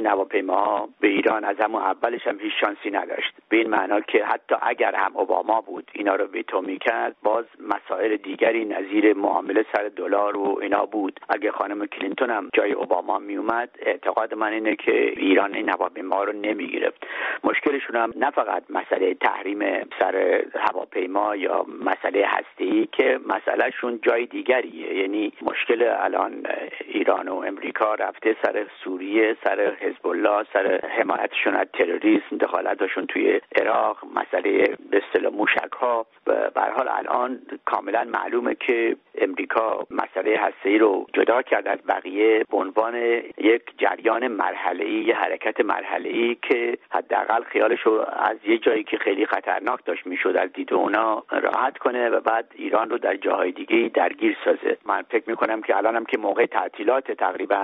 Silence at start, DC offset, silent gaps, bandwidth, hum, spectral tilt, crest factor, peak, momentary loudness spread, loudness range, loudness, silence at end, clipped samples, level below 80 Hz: 0 s; under 0.1%; none; 4.9 kHz; none; -1 dB/octave; 18 dB; -4 dBFS; 5 LU; 2 LU; -23 LUFS; 0 s; under 0.1%; -74 dBFS